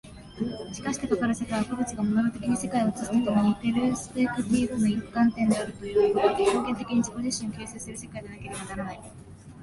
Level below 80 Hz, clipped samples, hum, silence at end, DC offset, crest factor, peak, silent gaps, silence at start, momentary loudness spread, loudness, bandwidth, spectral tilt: -52 dBFS; under 0.1%; none; 0 s; under 0.1%; 18 dB; -10 dBFS; none; 0.05 s; 14 LU; -27 LUFS; 11.5 kHz; -5.5 dB/octave